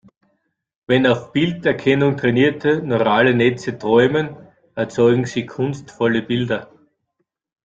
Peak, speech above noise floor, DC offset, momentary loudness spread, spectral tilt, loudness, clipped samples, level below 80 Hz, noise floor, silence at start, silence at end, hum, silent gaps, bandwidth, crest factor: -2 dBFS; 56 dB; under 0.1%; 10 LU; -6.5 dB/octave; -18 LUFS; under 0.1%; -56 dBFS; -73 dBFS; 0.9 s; 1 s; none; none; 7.8 kHz; 16 dB